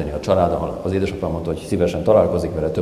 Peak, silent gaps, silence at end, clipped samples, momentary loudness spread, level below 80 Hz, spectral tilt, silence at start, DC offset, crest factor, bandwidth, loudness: -2 dBFS; none; 0 s; under 0.1%; 8 LU; -34 dBFS; -7.5 dB/octave; 0 s; under 0.1%; 18 dB; 14 kHz; -20 LUFS